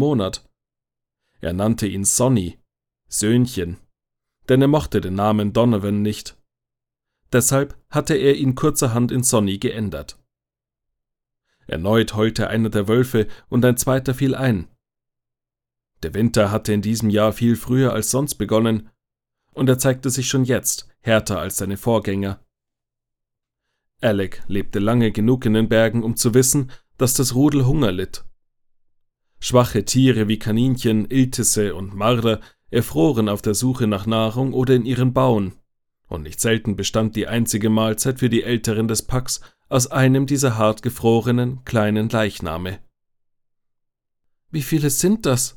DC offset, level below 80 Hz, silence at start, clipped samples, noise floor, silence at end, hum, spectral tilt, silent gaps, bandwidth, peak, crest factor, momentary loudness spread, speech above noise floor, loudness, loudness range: under 0.1%; -42 dBFS; 0 s; under 0.1%; -87 dBFS; 0.05 s; none; -5 dB/octave; none; 19 kHz; -2 dBFS; 18 dB; 10 LU; 69 dB; -19 LUFS; 4 LU